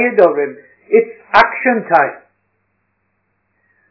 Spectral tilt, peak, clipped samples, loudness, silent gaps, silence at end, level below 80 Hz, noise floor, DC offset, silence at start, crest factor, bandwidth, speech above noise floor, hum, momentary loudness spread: -6.5 dB/octave; 0 dBFS; 0.3%; -14 LUFS; none; 1.75 s; -56 dBFS; -66 dBFS; under 0.1%; 0 s; 16 dB; 5.4 kHz; 54 dB; 50 Hz at -55 dBFS; 8 LU